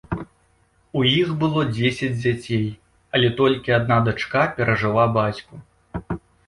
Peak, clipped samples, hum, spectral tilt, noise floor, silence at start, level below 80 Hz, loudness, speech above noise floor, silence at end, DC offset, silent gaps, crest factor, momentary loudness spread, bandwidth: -4 dBFS; under 0.1%; none; -6.5 dB/octave; -61 dBFS; 0.1 s; -46 dBFS; -21 LUFS; 41 dB; 0.3 s; under 0.1%; none; 16 dB; 13 LU; 11.5 kHz